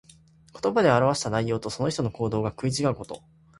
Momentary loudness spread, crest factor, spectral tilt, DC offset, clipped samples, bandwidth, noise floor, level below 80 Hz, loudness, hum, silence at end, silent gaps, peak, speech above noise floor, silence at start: 11 LU; 20 dB; -5.5 dB/octave; under 0.1%; under 0.1%; 11.5 kHz; -55 dBFS; -54 dBFS; -25 LUFS; none; 0.4 s; none; -6 dBFS; 30 dB; 0.55 s